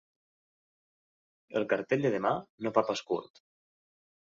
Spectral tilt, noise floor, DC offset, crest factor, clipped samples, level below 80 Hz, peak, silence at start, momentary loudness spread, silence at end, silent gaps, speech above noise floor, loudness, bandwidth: -5.5 dB/octave; under -90 dBFS; under 0.1%; 24 dB; under 0.1%; -74 dBFS; -10 dBFS; 1.5 s; 8 LU; 1.05 s; 2.50-2.58 s; over 59 dB; -31 LUFS; 7.6 kHz